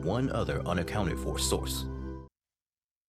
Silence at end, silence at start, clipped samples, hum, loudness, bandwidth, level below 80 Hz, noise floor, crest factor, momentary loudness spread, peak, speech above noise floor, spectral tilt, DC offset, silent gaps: 0.8 s; 0 s; under 0.1%; none; -32 LUFS; 15.5 kHz; -42 dBFS; under -90 dBFS; 20 dB; 11 LU; -12 dBFS; over 59 dB; -5 dB/octave; under 0.1%; none